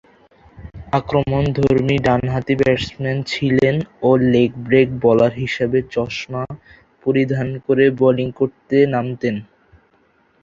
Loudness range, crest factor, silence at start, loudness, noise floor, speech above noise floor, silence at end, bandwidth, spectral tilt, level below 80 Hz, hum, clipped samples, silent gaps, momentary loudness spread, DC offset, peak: 2 LU; 16 dB; 0.6 s; -18 LUFS; -58 dBFS; 41 dB; 1 s; 7.6 kHz; -7.5 dB/octave; -44 dBFS; none; under 0.1%; none; 9 LU; under 0.1%; -2 dBFS